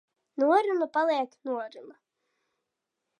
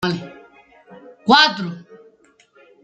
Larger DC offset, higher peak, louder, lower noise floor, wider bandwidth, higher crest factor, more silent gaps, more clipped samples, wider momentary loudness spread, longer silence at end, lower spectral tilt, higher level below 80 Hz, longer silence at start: neither; second, -10 dBFS vs -2 dBFS; second, -27 LUFS vs -16 LUFS; first, -85 dBFS vs -55 dBFS; second, 10 kHz vs 13.5 kHz; about the same, 20 dB vs 20 dB; neither; neither; second, 14 LU vs 25 LU; first, 1.3 s vs 1 s; about the same, -4 dB/octave vs -4 dB/octave; second, under -90 dBFS vs -62 dBFS; first, 0.35 s vs 0 s